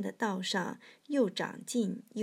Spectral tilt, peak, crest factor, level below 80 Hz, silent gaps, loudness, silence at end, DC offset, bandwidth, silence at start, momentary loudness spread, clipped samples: -4.5 dB/octave; -18 dBFS; 16 dB; under -90 dBFS; none; -34 LUFS; 0 s; under 0.1%; 16 kHz; 0 s; 7 LU; under 0.1%